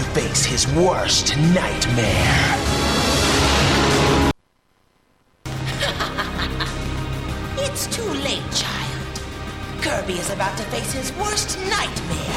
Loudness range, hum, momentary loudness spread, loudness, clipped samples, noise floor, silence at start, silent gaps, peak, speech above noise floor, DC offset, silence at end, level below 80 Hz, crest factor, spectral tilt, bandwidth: 8 LU; none; 11 LU; -20 LUFS; under 0.1%; -62 dBFS; 0 s; none; -6 dBFS; 43 dB; under 0.1%; 0 s; -32 dBFS; 14 dB; -3.5 dB/octave; 16.5 kHz